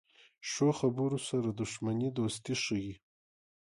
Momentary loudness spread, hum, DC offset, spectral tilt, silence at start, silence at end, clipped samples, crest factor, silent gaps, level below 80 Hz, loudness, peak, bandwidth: 10 LU; none; under 0.1%; -5 dB/octave; 0.45 s; 0.85 s; under 0.1%; 18 dB; none; -66 dBFS; -33 LUFS; -18 dBFS; 11.5 kHz